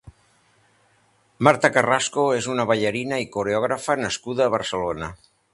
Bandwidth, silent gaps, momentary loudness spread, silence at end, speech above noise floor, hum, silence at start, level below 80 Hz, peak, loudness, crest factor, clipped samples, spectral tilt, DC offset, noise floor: 11.5 kHz; none; 8 LU; 0.4 s; 40 dB; none; 0.05 s; -54 dBFS; 0 dBFS; -22 LUFS; 22 dB; under 0.1%; -4 dB/octave; under 0.1%; -62 dBFS